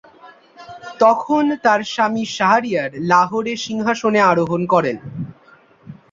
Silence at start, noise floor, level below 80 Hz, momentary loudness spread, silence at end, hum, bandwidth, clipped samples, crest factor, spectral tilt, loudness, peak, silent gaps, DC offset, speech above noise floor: 0.25 s; -50 dBFS; -60 dBFS; 14 LU; 0.2 s; none; 7.6 kHz; under 0.1%; 16 dB; -5 dB/octave; -17 LUFS; -2 dBFS; none; under 0.1%; 33 dB